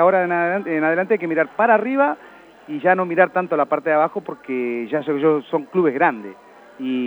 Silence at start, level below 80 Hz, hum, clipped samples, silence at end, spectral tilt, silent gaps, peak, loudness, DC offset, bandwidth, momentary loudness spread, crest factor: 0 s; -74 dBFS; none; under 0.1%; 0 s; -8.5 dB/octave; none; -2 dBFS; -19 LUFS; under 0.1%; 19.5 kHz; 11 LU; 18 dB